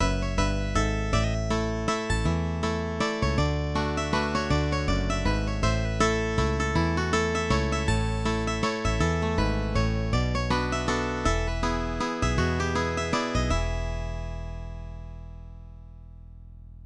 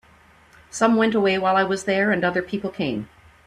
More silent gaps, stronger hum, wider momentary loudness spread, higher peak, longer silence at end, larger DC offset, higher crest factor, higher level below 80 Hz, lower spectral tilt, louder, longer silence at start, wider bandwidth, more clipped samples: neither; neither; about the same, 10 LU vs 12 LU; second, -10 dBFS vs -6 dBFS; second, 0 s vs 0.4 s; neither; about the same, 16 dB vs 16 dB; first, -32 dBFS vs -58 dBFS; about the same, -5.5 dB/octave vs -5 dB/octave; second, -27 LUFS vs -21 LUFS; second, 0 s vs 0.75 s; about the same, 11 kHz vs 12 kHz; neither